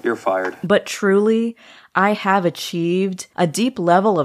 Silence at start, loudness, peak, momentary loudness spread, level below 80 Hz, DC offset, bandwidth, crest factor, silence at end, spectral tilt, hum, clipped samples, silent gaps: 0.05 s; -19 LUFS; -2 dBFS; 7 LU; -66 dBFS; under 0.1%; 15 kHz; 16 dB; 0 s; -5.5 dB/octave; none; under 0.1%; none